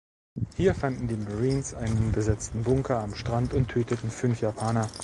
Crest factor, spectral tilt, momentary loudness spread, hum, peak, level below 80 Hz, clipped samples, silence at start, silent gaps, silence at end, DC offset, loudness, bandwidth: 16 dB; -6.5 dB/octave; 5 LU; none; -10 dBFS; -42 dBFS; under 0.1%; 0.35 s; none; 0 s; under 0.1%; -28 LUFS; 11.5 kHz